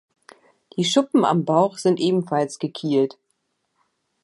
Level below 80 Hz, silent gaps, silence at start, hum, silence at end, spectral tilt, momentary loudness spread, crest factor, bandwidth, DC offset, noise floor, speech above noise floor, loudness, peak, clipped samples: -74 dBFS; none; 0.75 s; none; 1.15 s; -5.5 dB/octave; 8 LU; 18 dB; 11.5 kHz; under 0.1%; -73 dBFS; 53 dB; -21 LUFS; -4 dBFS; under 0.1%